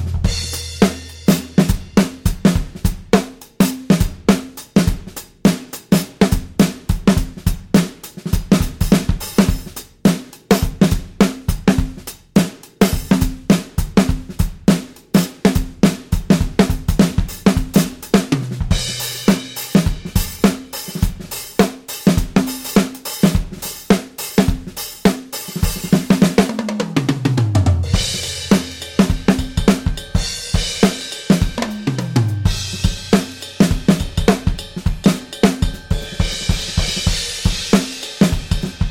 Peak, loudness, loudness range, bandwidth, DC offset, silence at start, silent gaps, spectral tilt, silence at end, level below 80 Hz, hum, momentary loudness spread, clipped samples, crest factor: -2 dBFS; -18 LUFS; 2 LU; 17 kHz; under 0.1%; 0 s; none; -5.5 dB/octave; 0 s; -26 dBFS; none; 7 LU; under 0.1%; 16 dB